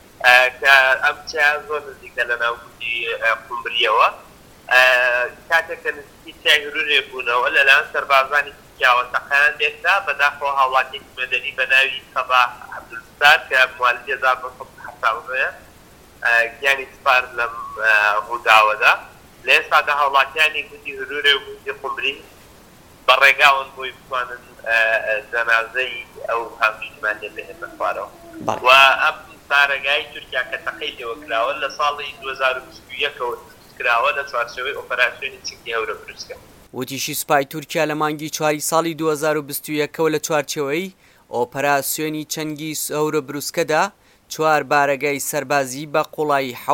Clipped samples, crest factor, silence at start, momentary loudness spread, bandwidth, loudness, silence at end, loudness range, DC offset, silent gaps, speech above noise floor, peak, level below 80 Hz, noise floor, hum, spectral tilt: under 0.1%; 20 dB; 0.2 s; 15 LU; 17 kHz; -18 LUFS; 0 s; 6 LU; under 0.1%; none; 27 dB; 0 dBFS; -56 dBFS; -46 dBFS; none; -2 dB/octave